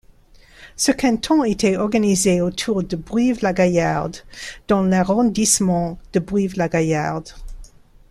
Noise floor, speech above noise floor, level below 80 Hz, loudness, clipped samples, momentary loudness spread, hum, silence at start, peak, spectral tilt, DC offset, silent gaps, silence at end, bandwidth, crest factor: -48 dBFS; 30 dB; -42 dBFS; -19 LUFS; under 0.1%; 10 LU; none; 0.6 s; -2 dBFS; -4.5 dB/octave; under 0.1%; none; 0.45 s; 14 kHz; 18 dB